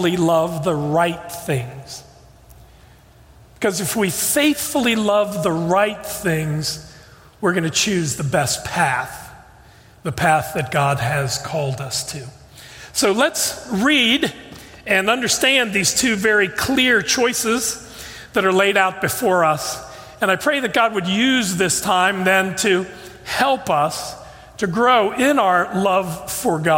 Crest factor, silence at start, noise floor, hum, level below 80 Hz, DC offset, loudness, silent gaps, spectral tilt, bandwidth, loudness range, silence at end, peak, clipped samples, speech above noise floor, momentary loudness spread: 18 dB; 0 s; -47 dBFS; none; -50 dBFS; under 0.1%; -18 LUFS; none; -3.5 dB/octave; 16.5 kHz; 5 LU; 0 s; -2 dBFS; under 0.1%; 29 dB; 14 LU